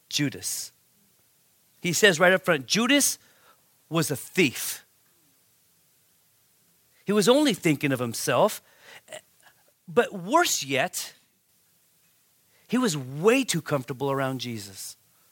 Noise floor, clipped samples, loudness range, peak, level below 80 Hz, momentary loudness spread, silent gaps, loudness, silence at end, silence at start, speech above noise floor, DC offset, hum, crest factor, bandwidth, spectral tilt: -66 dBFS; under 0.1%; 6 LU; -4 dBFS; -74 dBFS; 18 LU; none; -24 LUFS; 0.4 s; 0.1 s; 41 dB; under 0.1%; none; 24 dB; 17 kHz; -3.5 dB/octave